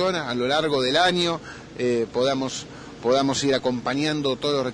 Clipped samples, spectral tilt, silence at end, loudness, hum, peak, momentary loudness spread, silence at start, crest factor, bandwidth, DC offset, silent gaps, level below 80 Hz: under 0.1%; -4 dB/octave; 0 s; -23 LUFS; none; -6 dBFS; 10 LU; 0 s; 18 dB; 10.5 kHz; under 0.1%; none; -54 dBFS